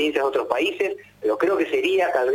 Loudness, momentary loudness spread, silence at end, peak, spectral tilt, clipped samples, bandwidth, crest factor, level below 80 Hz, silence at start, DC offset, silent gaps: -22 LUFS; 6 LU; 0 s; -4 dBFS; -3.5 dB/octave; under 0.1%; 16 kHz; 18 dB; -64 dBFS; 0 s; under 0.1%; none